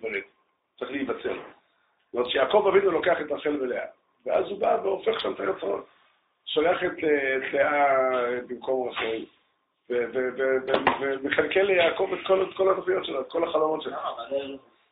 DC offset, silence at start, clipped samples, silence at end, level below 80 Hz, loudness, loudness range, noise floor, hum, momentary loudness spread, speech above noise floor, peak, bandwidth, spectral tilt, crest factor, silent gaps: under 0.1%; 0 s; under 0.1%; 0.35 s; -64 dBFS; -26 LUFS; 3 LU; -71 dBFS; none; 12 LU; 46 dB; -6 dBFS; 4.3 kHz; -1.5 dB/octave; 20 dB; none